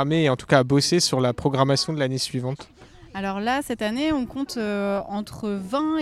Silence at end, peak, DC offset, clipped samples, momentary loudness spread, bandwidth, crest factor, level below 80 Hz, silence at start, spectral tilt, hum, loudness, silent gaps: 0 s; -2 dBFS; under 0.1%; under 0.1%; 11 LU; 14.5 kHz; 20 dB; -52 dBFS; 0 s; -5 dB/octave; none; -23 LUFS; none